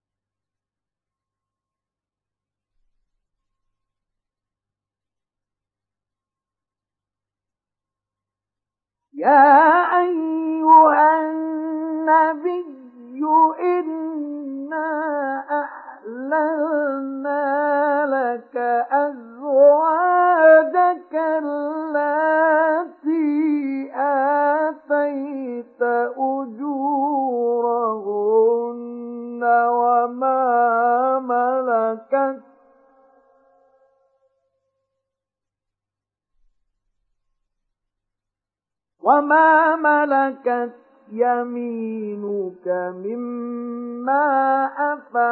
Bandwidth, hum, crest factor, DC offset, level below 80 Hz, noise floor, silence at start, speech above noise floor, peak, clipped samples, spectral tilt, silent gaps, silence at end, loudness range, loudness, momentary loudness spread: 4.4 kHz; none; 18 dB; under 0.1%; -82 dBFS; -90 dBFS; 9.15 s; 71 dB; -2 dBFS; under 0.1%; -9.5 dB/octave; none; 0 s; 8 LU; -19 LUFS; 14 LU